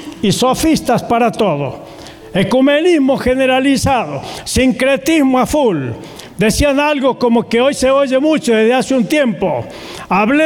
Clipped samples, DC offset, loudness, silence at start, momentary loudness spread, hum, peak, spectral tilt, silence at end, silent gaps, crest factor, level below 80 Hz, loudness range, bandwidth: under 0.1%; under 0.1%; -13 LUFS; 0 s; 11 LU; none; -4 dBFS; -5 dB/octave; 0 s; none; 10 dB; -36 dBFS; 1 LU; 18 kHz